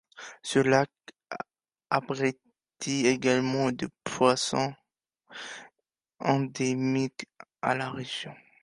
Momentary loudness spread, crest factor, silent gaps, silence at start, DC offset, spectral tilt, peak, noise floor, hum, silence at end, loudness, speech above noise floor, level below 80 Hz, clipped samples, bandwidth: 18 LU; 22 dB; none; 0.15 s; under 0.1%; -4.5 dB/octave; -6 dBFS; -85 dBFS; none; 0.3 s; -28 LUFS; 57 dB; -68 dBFS; under 0.1%; 11.5 kHz